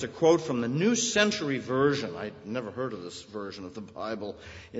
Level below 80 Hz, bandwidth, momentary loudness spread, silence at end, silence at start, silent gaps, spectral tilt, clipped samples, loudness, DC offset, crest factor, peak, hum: -62 dBFS; 8 kHz; 16 LU; 0 s; 0 s; none; -4 dB/octave; under 0.1%; -28 LUFS; under 0.1%; 22 dB; -8 dBFS; none